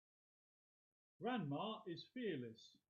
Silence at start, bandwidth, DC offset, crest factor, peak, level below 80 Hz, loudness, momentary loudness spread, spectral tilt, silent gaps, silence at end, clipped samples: 1.2 s; 7 kHz; under 0.1%; 18 dB; -32 dBFS; -90 dBFS; -47 LUFS; 7 LU; -4.5 dB/octave; none; 0.2 s; under 0.1%